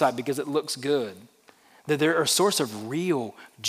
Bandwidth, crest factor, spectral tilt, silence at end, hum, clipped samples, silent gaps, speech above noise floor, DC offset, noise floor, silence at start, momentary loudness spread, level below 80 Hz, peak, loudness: 16 kHz; 18 dB; -3.5 dB/octave; 0 s; none; under 0.1%; none; 31 dB; under 0.1%; -57 dBFS; 0 s; 10 LU; -84 dBFS; -8 dBFS; -25 LUFS